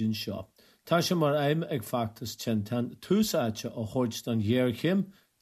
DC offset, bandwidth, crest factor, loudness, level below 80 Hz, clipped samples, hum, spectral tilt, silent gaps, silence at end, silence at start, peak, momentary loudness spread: under 0.1%; 14 kHz; 16 dB; -29 LUFS; -66 dBFS; under 0.1%; none; -5.5 dB/octave; none; 0.3 s; 0 s; -14 dBFS; 9 LU